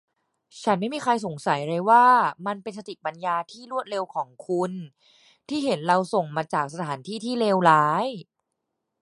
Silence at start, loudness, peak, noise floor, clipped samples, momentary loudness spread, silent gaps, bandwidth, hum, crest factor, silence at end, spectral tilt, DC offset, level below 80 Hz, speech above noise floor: 0.55 s; -24 LUFS; -4 dBFS; -80 dBFS; under 0.1%; 14 LU; none; 11.5 kHz; none; 22 dB; 0.8 s; -5.5 dB/octave; under 0.1%; -74 dBFS; 57 dB